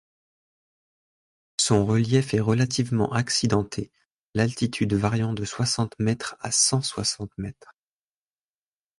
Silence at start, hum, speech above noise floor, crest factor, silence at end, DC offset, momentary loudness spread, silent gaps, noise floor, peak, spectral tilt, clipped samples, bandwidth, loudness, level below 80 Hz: 1.6 s; none; over 66 dB; 18 dB; 1.45 s; under 0.1%; 12 LU; 4.06-4.30 s; under -90 dBFS; -8 dBFS; -4.5 dB/octave; under 0.1%; 11.5 kHz; -24 LUFS; -52 dBFS